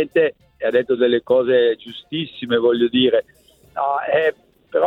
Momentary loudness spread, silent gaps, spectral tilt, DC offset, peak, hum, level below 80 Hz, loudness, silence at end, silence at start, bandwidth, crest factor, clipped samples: 10 LU; none; -7 dB/octave; under 0.1%; -4 dBFS; none; -62 dBFS; -19 LUFS; 0 s; 0 s; 4.2 kHz; 14 dB; under 0.1%